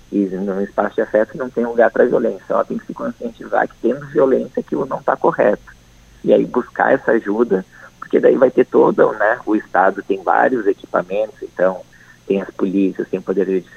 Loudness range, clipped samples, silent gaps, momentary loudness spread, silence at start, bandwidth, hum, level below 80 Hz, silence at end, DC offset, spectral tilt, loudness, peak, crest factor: 4 LU; under 0.1%; none; 9 LU; 0.1 s; 8.4 kHz; none; -54 dBFS; 0.15 s; under 0.1%; -8 dB/octave; -17 LUFS; 0 dBFS; 16 dB